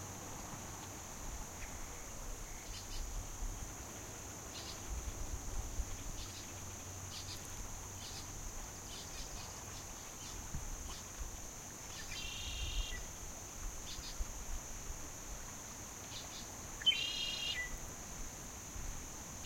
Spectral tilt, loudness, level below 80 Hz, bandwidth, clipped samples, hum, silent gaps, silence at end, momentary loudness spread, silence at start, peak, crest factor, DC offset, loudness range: -2 dB/octave; -44 LUFS; -48 dBFS; 16.5 kHz; under 0.1%; none; none; 0 s; 7 LU; 0 s; -22 dBFS; 24 dB; under 0.1%; 8 LU